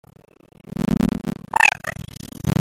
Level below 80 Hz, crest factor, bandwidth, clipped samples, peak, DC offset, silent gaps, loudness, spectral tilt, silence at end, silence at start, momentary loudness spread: -42 dBFS; 22 dB; 17 kHz; under 0.1%; 0 dBFS; under 0.1%; none; -20 LUFS; -5 dB/octave; 0 s; 0.8 s; 18 LU